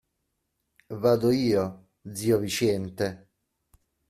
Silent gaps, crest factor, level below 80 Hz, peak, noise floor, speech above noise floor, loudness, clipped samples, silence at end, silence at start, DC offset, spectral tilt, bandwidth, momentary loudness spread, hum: none; 18 dB; -62 dBFS; -10 dBFS; -79 dBFS; 53 dB; -26 LUFS; under 0.1%; 0.9 s; 0.9 s; under 0.1%; -5.5 dB/octave; 15.5 kHz; 14 LU; none